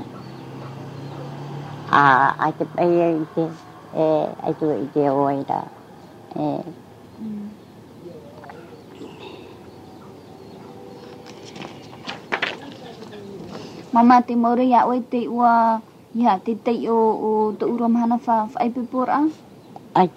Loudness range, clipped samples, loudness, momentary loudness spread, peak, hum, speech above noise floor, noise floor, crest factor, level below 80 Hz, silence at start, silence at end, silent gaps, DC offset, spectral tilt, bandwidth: 20 LU; under 0.1%; -20 LUFS; 24 LU; -2 dBFS; none; 24 dB; -43 dBFS; 20 dB; -66 dBFS; 0 s; 0.05 s; none; under 0.1%; -7 dB/octave; 8.6 kHz